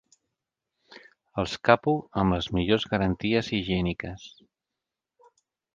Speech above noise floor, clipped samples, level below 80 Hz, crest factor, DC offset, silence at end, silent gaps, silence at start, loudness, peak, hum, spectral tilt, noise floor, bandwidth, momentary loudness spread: 62 dB; under 0.1%; -46 dBFS; 26 dB; under 0.1%; 1.45 s; none; 0.9 s; -26 LUFS; -2 dBFS; none; -6.5 dB/octave; -87 dBFS; 7.6 kHz; 13 LU